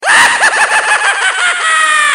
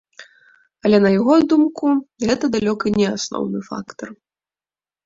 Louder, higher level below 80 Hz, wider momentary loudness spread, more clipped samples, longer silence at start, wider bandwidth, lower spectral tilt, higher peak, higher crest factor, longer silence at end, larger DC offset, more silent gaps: first, -8 LUFS vs -18 LUFS; about the same, -56 dBFS vs -54 dBFS; second, 4 LU vs 16 LU; first, 0.2% vs under 0.1%; second, 0 s vs 0.2 s; first, over 20 kHz vs 7.8 kHz; second, 2 dB/octave vs -5.5 dB/octave; about the same, 0 dBFS vs -2 dBFS; second, 10 dB vs 18 dB; second, 0 s vs 0.9 s; neither; neither